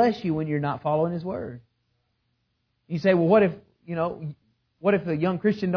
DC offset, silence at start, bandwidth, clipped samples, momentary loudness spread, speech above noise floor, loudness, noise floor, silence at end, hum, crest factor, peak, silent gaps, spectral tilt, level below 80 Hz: under 0.1%; 0 s; 5.4 kHz; under 0.1%; 15 LU; 50 dB; -25 LUFS; -74 dBFS; 0 s; none; 18 dB; -8 dBFS; none; -9 dB/octave; -62 dBFS